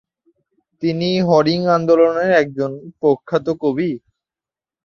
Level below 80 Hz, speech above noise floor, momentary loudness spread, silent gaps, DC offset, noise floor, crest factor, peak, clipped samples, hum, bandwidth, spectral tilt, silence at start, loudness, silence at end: -58 dBFS; 74 dB; 10 LU; none; under 0.1%; -90 dBFS; 16 dB; -2 dBFS; under 0.1%; none; 6.8 kHz; -7 dB/octave; 0.8 s; -17 LUFS; 0.85 s